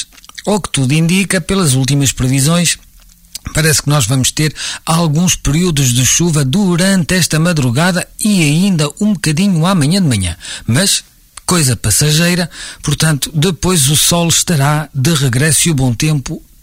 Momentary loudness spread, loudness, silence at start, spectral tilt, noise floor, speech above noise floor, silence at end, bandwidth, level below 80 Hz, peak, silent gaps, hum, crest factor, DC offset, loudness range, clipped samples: 7 LU; -12 LUFS; 0 s; -4 dB/octave; -42 dBFS; 30 dB; 0.25 s; 16.5 kHz; -34 dBFS; 0 dBFS; none; none; 12 dB; under 0.1%; 2 LU; under 0.1%